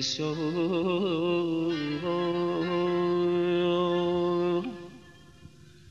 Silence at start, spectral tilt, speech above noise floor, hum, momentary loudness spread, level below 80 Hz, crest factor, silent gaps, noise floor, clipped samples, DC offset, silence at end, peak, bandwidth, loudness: 0 s; -6 dB/octave; 24 dB; none; 4 LU; -64 dBFS; 10 dB; none; -52 dBFS; under 0.1%; under 0.1%; 0.4 s; -18 dBFS; 7.4 kHz; -28 LUFS